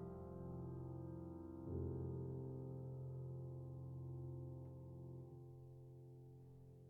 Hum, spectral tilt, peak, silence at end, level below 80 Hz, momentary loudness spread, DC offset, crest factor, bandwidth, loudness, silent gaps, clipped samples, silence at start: none; -13 dB/octave; -36 dBFS; 0 s; -70 dBFS; 12 LU; under 0.1%; 16 dB; 1.7 kHz; -52 LUFS; none; under 0.1%; 0 s